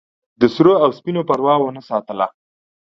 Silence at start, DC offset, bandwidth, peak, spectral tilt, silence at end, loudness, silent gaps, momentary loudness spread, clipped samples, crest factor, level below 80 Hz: 0.4 s; under 0.1%; 7 kHz; 0 dBFS; -8 dB/octave; 0.6 s; -17 LUFS; none; 11 LU; under 0.1%; 18 dB; -60 dBFS